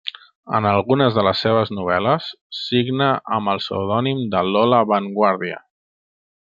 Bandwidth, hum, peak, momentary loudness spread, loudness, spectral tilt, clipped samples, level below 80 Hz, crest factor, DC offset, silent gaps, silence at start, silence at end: 7.6 kHz; none; -2 dBFS; 9 LU; -19 LUFS; -7.5 dB/octave; under 0.1%; -62 dBFS; 18 dB; under 0.1%; 0.35-0.43 s, 2.41-2.50 s; 0.05 s; 0.9 s